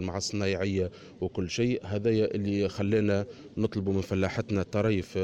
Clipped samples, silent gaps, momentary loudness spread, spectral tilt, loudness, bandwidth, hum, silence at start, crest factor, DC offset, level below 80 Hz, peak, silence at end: under 0.1%; none; 6 LU; -6 dB/octave; -29 LUFS; 10 kHz; none; 0 s; 14 dB; under 0.1%; -56 dBFS; -14 dBFS; 0 s